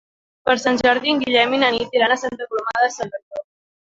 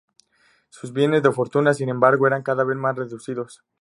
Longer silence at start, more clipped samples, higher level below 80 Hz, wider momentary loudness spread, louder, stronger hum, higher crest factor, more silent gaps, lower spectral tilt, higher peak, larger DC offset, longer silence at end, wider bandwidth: second, 0.45 s vs 0.85 s; neither; first, -56 dBFS vs -70 dBFS; about the same, 12 LU vs 14 LU; about the same, -19 LUFS vs -21 LUFS; neither; about the same, 18 dB vs 20 dB; first, 3.23-3.31 s vs none; second, -3 dB/octave vs -6.5 dB/octave; about the same, -2 dBFS vs -2 dBFS; neither; first, 0.55 s vs 0.25 s; second, 7.8 kHz vs 11.5 kHz